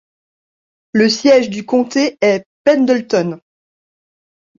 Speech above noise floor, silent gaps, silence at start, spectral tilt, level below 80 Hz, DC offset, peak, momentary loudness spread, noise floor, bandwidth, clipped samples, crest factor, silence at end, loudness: over 77 dB; 2.46-2.65 s; 0.95 s; -4.5 dB/octave; -60 dBFS; under 0.1%; -2 dBFS; 7 LU; under -90 dBFS; 7.6 kHz; under 0.1%; 14 dB; 1.2 s; -14 LUFS